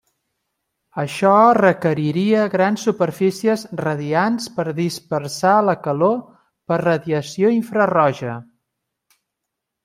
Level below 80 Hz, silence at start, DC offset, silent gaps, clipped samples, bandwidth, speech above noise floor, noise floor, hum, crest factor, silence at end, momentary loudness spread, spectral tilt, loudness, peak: -64 dBFS; 0.95 s; under 0.1%; none; under 0.1%; 16 kHz; 63 dB; -80 dBFS; none; 18 dB; 1.4 s; 10 LU; -6 dB/octave; -18 LUFS; -2 dBFS